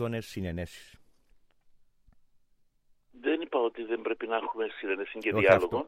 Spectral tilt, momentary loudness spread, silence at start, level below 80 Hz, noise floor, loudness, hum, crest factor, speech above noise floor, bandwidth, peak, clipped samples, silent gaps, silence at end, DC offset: -6.5 dB/octave; 14 LU; 0 s; -58 dBFS; -67 dBFS; -30 LUFS; none; 24 dB; 37 dB; 15.5 kHz; -8 dBFS; under 0.1%; none; 0 s; under 0.1%